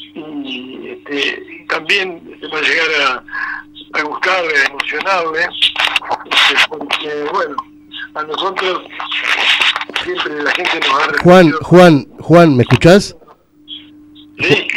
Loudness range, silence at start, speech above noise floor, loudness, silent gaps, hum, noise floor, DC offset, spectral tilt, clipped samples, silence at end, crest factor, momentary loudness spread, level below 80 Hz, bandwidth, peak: 7 LU; 0 s; 32 dB; -12 LUFS; none; none; -44 dBFS; under 0.1%; -5 dB/octave; 0.5%; 0 s; 14 dB; 18 LU; -44 dBFS; 15.5 kHz; 0 dBFS